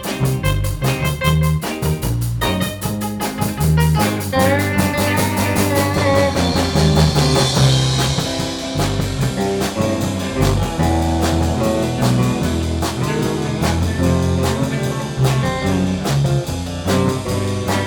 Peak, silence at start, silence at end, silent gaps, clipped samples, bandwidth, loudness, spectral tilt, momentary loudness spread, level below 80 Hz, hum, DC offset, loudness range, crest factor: 0 dBFS; 0 s; 0 s; none; under 0.1%; 19.5 kHz; -18 LUFS; -5.5 dB/octave; 6 LU; -30 dBFS; none; under 0.1%; 3 LU; 16 dB